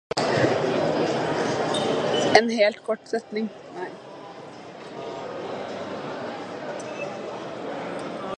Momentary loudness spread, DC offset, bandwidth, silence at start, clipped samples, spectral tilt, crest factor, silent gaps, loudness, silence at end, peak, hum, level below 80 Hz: 15 LU; under 0.1%; 11 kHz; 0.15 s; under 0.1%; -4.5 dB/octave; 26 dB; none; -26 LUFS; 0.05 s; 0 dBFS; none; -62 dBFS